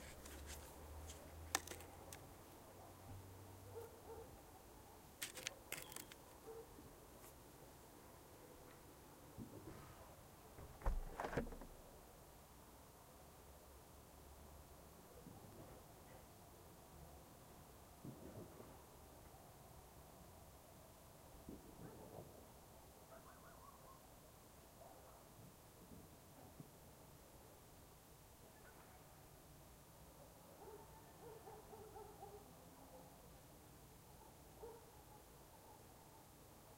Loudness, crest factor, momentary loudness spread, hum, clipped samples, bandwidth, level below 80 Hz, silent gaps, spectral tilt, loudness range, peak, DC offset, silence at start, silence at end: -58 LUFS; 40 dB; 12 LU; none; under 0.1%; 16 kHz; -62 dBFS; none; -3.5 dB/octave; 9 LU; -18 dBFS; under 0.1%; 0 s; 0 s